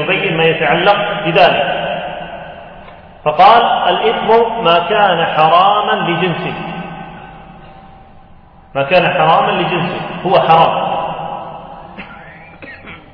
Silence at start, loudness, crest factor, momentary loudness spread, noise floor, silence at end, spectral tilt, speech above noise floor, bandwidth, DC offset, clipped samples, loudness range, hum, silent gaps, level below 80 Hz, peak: 0 s; -12 LUFS; 14 dB; 22 LU; -40 dBFS; 0.15 s; -7.5 dB/octave; 29 dB; 5.4 kHz; under 0.1%; under 0.1%; 6 LU; none; none; -46 dBFS; 0 dBFS